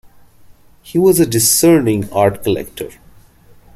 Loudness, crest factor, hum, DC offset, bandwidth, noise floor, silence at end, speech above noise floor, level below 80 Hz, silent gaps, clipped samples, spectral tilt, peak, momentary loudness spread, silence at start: -13 LUFS; 16 dB; none; under 0.1%; 16 kHz; -44 dBFS; 0.85 s; 31 dB; -46 dBFS; none; under 0.1%; -4.5 dB/octave; 0 dBFS; 16 LU; 0.85 s